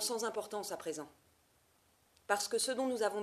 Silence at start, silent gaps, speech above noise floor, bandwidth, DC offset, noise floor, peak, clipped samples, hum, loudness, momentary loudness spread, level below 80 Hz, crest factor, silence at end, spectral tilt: 0 s; none; 34 dB; 15 kHz; under 0.1%; -71 dBFS; -16 dBFS; under 0.1%; none; -37 LUFS; 12 LU; -80 dBFS; 22 dB; 0 s; -1.5 dB/octave